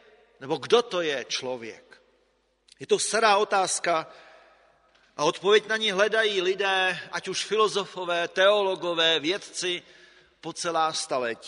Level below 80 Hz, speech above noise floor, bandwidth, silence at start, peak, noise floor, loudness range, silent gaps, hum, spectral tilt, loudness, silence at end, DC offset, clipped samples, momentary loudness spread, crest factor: -74 dBFS; 43 dB; 10.5 kHz; 0.4 s; -6 dBFS; -69 dBFS; 3 LU; none; none; -2 dB/octave; -25 LUFS; 0 s; under 0.1%; under 0.1%; 12 LU; 20 dB